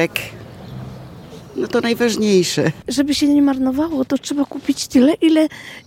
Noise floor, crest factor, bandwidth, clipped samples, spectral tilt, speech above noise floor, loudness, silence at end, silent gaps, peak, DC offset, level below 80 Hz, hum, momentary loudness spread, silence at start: -37 dBFS; 16 dB; 16.5 kHz; under 0.1%; -4.5 dB/octave; 20 dB; -17 LUFS; 0.05 s; none; -2 dBFS; under 0.1%; -50 dBFS; none; 20 LU; 0 s